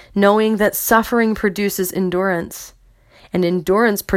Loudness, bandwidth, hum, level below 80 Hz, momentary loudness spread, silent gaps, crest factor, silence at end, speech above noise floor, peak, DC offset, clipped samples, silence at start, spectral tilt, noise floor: -17 LUFS; 17 kHz; none; -46 dBFS; 8 LU; none; 18 dB; 0 s; 32 dB; 0 dBFS; under 0.1%; under 0.1%; 0.15 s; -5 dB/octave; -49 dBFS